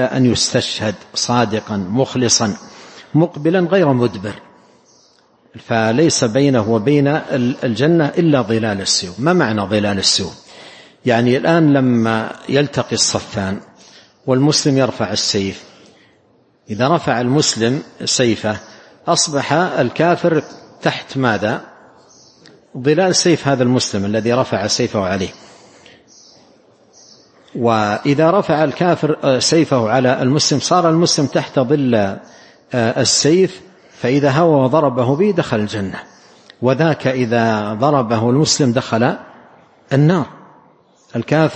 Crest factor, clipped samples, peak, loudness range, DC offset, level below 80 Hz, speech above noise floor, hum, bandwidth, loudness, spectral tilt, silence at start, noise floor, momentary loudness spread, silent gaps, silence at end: 16 dB; under 0.1%; 0 dBFS; 4 LU; under 0.1%; -54 dBFS; 39 dB; none; 8.8 kHz; -15 LUFS; -4.5 dB/octave; 0 s; -55 dBFS; 9 LU; none; 0 s